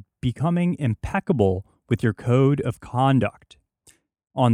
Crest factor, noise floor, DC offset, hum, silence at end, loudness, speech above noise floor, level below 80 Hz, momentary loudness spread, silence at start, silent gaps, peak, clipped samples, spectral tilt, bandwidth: 18 dB; -59 dBFS; under 0.1%; none; 0 s; -23 LUFS; 38 dB; -48 dBFS; 9 LU; 0.25 s; none; -4 dBFS; under 0.1%; -8 dB/octave; 11 kHz